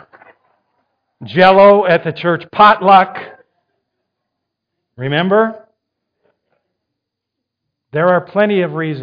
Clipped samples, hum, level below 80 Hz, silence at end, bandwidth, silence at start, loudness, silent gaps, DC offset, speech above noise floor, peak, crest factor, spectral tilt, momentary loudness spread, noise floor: under 0.1%; none; -58 dBFS; 0 s; 5.2 kHz; 1.2 s; -12 LUFS; none; under 0.1%; 67 dB; 0 dBFS; 16 dB; -8 dB/octave; 13 LU; -78 dBFS